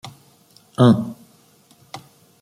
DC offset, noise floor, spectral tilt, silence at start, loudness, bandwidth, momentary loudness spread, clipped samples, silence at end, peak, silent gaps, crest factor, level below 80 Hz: under 0.1%; -54 dBFS; -8 dB/octave; 0.05 s; -17 LUFS; 14.5 kHz; 24 LU; under 0.1%; 0.45 s; -2 dBFS; none; 20 dB; -62 dBFS